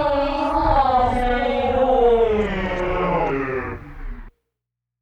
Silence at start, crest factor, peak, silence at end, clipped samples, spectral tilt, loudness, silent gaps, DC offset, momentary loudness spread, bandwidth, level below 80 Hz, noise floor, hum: 0 s; 14 dB; -6 dBFS; 0.75 s; under 0.1%; -7 dB/octave; -19 LUFS; none; under 0.1%; 15 LU; 9.4 kHz; -32 dBFS; -83 dBFS; none